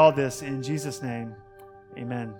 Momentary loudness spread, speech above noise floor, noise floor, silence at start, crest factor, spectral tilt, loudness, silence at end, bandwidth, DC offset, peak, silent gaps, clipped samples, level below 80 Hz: 19 LU; 20 dB; -48 dBFS; 0 s; 22 dB; -5.5 dB/octave; -29 LUFS; 0 s; 18 kHz; under 0.1%; -6 dBFS; none; under 0.1%; -62 dBFS